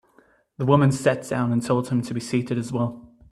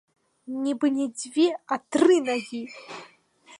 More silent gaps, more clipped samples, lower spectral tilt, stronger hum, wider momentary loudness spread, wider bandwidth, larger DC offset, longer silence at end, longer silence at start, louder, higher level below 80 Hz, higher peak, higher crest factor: neither; neither; first, -7 dB/octave vs -3.5 dB/octave; neither; second, 9 LU vs 19 LU; first, 12.5 kHz vs 11 kHz; neither; first, 0.25 s vs 0.05 s; first, 0.6 s vs 0.45 s; about the same, -23 LUFS vs -24 LUFS; first, -58 dBFS vs -78 dBFS; first, -2 dBFS vs -8 dBFS; about the same, 20 dB vs 18 dB